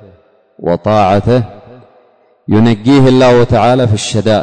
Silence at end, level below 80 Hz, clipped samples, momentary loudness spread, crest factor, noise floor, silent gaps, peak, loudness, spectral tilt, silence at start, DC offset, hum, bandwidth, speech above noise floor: 0 s; -36 dBFS; under 0.1%; 10 LU; 10 dB; -49 dBFS; none; -2 dBFS; -10 LUFS; -6.5 dB/octave; 0.6 s; under 0.1%; none; 9.6 kHz; 40 dB